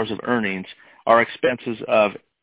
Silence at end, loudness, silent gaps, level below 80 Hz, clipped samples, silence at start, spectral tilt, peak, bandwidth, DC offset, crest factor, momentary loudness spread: 0.25 s; -21 LUFS; none; -60 dBFS; under 0.1%; 0 s; -9 dB/octave; -2 dBFS; 4 kHz; under 0.1%; 18 dB; 12 LU